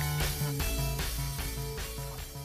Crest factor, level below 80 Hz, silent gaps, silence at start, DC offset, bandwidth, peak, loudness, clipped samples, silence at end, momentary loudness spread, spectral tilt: 14 dB; -38 dBFS; none; 0 s; under 0.1%; 15.5 kHz; -20 dBFS; -34 LUFS; under 0.1%; 0 s; 7 LU; -4 dB/octave